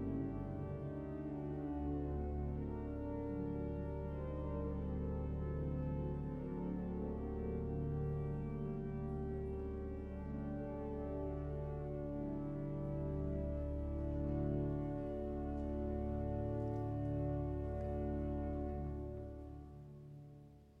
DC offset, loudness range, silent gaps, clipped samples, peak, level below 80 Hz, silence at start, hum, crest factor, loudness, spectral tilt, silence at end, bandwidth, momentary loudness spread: under 0.1%; 3 LU; none; under 0.1%; -26 dBFS; -48 dBFS; 0 s; none; 14 dB; -43 LUFS; -11 dB/octave; 0 s; 3.7 kHz; 4 LU